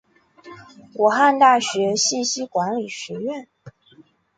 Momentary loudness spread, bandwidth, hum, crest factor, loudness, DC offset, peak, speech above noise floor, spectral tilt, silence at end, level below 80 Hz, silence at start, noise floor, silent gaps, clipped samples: 15 LU; 9.4 kHz; none; 18 dB; -19 LUFS; under 0.1%; -2 dBFS; 34 dB; -2.5 dB/octave; 0.7 s; -68 dBFS; 0.45 s; -53 dBFS; none; under 0.1%